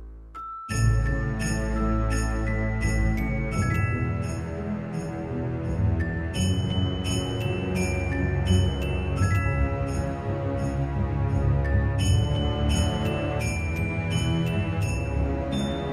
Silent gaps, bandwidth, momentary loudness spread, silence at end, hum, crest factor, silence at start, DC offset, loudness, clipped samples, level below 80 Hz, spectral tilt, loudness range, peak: none; 14 kHz; 6 LU; 0 s; none; 16 dB; 0 s; under 0.1%; -26 LUFS; under 0.1%; -32 dBFS; -6 dB/octave; 3 LU; -10 dBFS